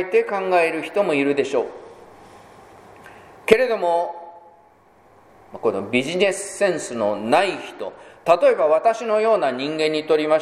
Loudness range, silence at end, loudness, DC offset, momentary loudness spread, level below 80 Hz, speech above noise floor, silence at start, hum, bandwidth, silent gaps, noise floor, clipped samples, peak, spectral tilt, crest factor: 5 LU; 0 s; -20 LUFS; under 0.1%; 13 LU; -60 dBFS; 34 dB; 0 s; none; 13 kHz; none; -53 dBFS; under 0.1%; 0 dBFS; -4 dB/octave; 20 dB